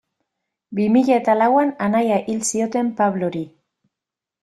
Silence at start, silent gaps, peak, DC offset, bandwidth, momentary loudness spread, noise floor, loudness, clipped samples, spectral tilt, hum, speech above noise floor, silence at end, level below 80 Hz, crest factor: 0.7 s; none; -4 dBFS; under 0.1%; 13 kHz; 10 LU; -86 dBFS; -19 LUFS; under 0.1%; -5.5 dB/octave; none; 68 dB; 0.95 s; -64 dBFS; 16 dB